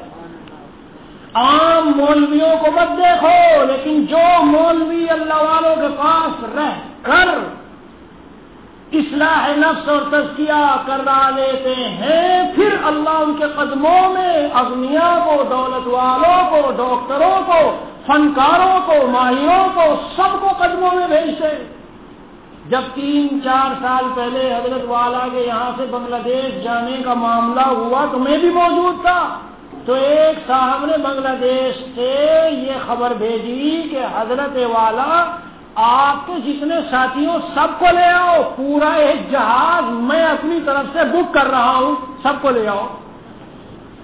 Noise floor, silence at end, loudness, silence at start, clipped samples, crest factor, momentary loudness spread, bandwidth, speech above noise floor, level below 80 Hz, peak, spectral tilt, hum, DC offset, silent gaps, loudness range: -40 dBFS; 0 s; -15 LUFS; 0 s; under 0.1%; 14 dB; 8 LU; 4 kHz; 25 dB; -48 dBFS; -2 dBFS; -8 dB/octave; none; 0.2%; none; 5 LU